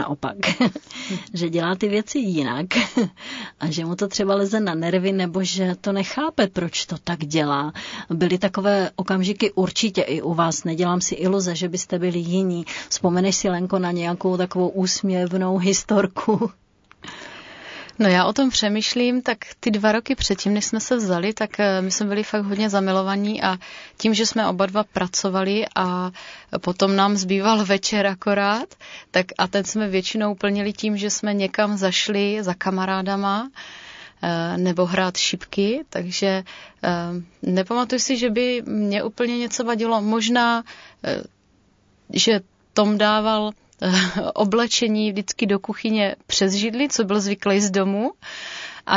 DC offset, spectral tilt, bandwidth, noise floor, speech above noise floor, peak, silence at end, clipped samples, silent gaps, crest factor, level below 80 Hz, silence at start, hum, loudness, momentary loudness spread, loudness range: under 0.1%; -4 dB/octave; 7.6 kHz; -60 dBFS; 38 dB; -2 dBFS; 0 s; under 0.1%; none; 20 dB; -54 dBFS; 0 s; none; -21 LUFS; 9 LU; 2 LU